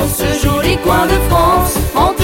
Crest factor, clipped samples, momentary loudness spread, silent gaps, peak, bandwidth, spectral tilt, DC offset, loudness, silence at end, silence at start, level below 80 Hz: 12 dB; under 0.1%; 3 LU; none; 0 dBFS; 17 kHz; -5 dB/octave; under 0.1%; -13 LUFS; 0 s; 0 s; -20 dBFS